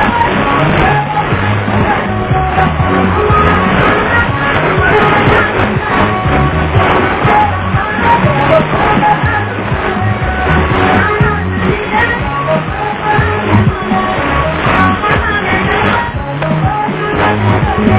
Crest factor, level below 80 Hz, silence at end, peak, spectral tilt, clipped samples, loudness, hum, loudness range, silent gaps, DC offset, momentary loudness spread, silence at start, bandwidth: 10 dB; -24 dBFS; 0 s; 0 dBFS; -10 dB/octave; 0.3%; -11 LUFS; none; 2 LU; none; under 0.1%; 4 LU; 0 s; 4 kHz